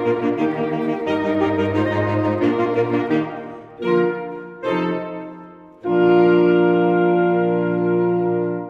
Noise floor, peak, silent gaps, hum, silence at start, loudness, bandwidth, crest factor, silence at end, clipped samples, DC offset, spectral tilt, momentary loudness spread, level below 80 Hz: -40 dBFS; -4 dBFS; none; none; 0 s; -19 LUFS; 6 kHz; 16 dB; 0 s; under 0.1%; under 0.1%; -9 dB/octave; 14 LU; -58 dBFS